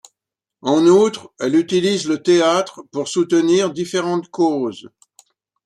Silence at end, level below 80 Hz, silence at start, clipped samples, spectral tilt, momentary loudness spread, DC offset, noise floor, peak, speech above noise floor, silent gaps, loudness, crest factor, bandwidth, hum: 0.8 s; -64 dBFS; 0.65 s; under 0.1%; -5 dB/octave; 13 LU; under 0.1%; -85 dBFS; -2 dBFS; 68 dB; none; -17 LUFS; 16 dB; 11.5 kHz; none